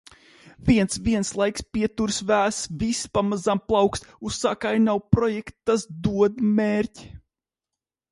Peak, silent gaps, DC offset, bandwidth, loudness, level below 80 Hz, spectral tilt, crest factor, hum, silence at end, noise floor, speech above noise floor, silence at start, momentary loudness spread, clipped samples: -2 dBFS; none; under 0.1%; 11.5 kHz; -23 LUFS; -44 dBFS; -5 dB/octave; 22 dB; none; 0.95 s; -88 dBFS; 65 dB; 0.45 s; 6 LU; under 0.1%